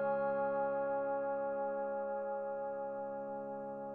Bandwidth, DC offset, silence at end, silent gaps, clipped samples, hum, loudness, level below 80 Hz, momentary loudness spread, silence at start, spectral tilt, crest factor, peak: 3.4 kHz; under 0.1%; 0 s; none; under 0.1%; none; -38 LUFS; -78 dBFS; 8 LU; 0 s; -9.5 dB/octave; 12 dB; -26 dBFS